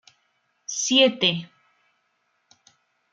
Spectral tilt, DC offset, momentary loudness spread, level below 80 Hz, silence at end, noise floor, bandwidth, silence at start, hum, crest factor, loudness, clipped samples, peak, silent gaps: -2.5 dB/octave; under 0.1%; 15 LU; -74 dBFS; 1.65 s; -71 dBFS; 9.4 kHz; 0.7 s; none; 22 dB; -21 LUFS; under 0.1%; -6 dBFS; none